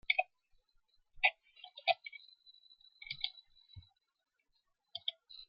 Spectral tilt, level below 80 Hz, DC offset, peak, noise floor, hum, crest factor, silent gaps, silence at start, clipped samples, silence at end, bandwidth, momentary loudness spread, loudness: 3.5 dB/octave; -72 dBFS; under 0.1%; -14 dBFS; -81 dBFS; none; 28 dB; none; 0.1 s; under 0.1%; 0.05 s; 5.6 kHz; 26 LU; -37 LUFS